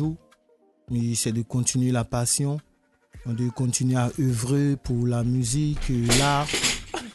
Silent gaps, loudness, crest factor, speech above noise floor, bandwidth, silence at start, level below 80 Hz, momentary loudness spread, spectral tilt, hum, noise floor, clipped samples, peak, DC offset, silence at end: none; -24 LUFS; 18 dB; 39 dB; 12.5 kHz; 0 s; -42 dBFS; 9 LU; -4.5 dB/octave; none; -62 dBFS; under 0.1%; -6 dBFS; under 0.1%; 0 s